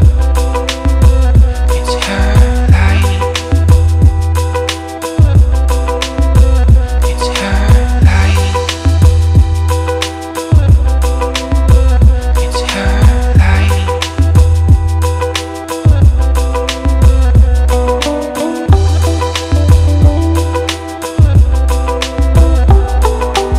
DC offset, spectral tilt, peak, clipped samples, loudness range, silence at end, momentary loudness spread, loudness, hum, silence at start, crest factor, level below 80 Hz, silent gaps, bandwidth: under 0.1%; -6 dB/octave; 0 dBFS; 1%; 1 LU; 0 s; 6 LU; -11 LUFS; none; 0 s; 8 dB; -12 dBFS; none; 13.5 kHz